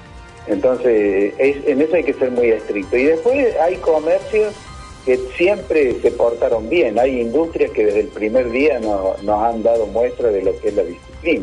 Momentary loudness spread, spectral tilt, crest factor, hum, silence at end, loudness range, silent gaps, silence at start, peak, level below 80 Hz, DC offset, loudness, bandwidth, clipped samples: 5 LU; -6 dB/octave; 14 dB; none; 0 s; 1 LU; none; 0 s; -4 dBFS; -42 dBFS; under 0.1%; -17 LUFS; 10.5 kHz; under 0.1%